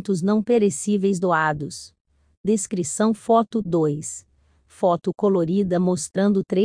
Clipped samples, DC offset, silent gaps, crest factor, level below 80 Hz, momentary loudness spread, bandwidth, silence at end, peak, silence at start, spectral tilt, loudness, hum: under 0.1%; under 0.1%; 2.01-2.05 s, 2.37-2.44 s; 16 dB; -58 dBFS; 10 LU; 10.5 kHz; 0 s; -6 dBFS; 0 s; -6 dB/octave; -21 LUFS; none